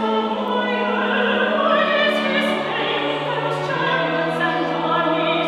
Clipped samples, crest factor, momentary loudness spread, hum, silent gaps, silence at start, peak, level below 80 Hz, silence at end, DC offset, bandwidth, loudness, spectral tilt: under 0.1%; 14 dB; 4 LU; none; none; 0 s; -6 dBFS; -62 dBFS; 0 s; under 0.1%; 13.5 kHz; -19 LUFS; -5.5 dB/octave